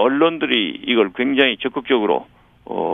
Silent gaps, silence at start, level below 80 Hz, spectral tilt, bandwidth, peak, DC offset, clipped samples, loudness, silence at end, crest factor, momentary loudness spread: none; 0 s; -58 dBFS; -7 dB/octave; 3.9 kHz; 0 dBFS; under 0.1%; under 0.1%; -18 LUFS; 0 s; 18 dB; 8 LU